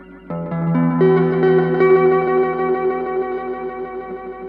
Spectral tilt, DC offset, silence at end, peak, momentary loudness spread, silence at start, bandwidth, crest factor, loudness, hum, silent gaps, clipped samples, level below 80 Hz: -11 dB/octave; under 0.1%; 0 s; -2 dBFS; 15 LU; 0 s; 4.5 kHz; 14 dB; -17 LUFS; none; none; under 0.1%; -52 dBFS